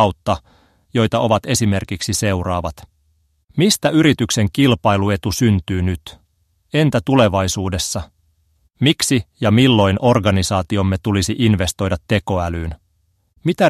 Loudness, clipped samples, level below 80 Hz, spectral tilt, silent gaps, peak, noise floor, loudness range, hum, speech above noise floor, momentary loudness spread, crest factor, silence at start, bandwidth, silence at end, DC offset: -17 LUFS; under 0.1%; -40 dBFS; -5 dB/octave; 3.44-3.48 s; 0 dBFS; -63 dBFS; 4 LU; none; 47 dB; 9 LU; 16 dB; 0 s; 14.5 kHz; 0 s; under 0.1%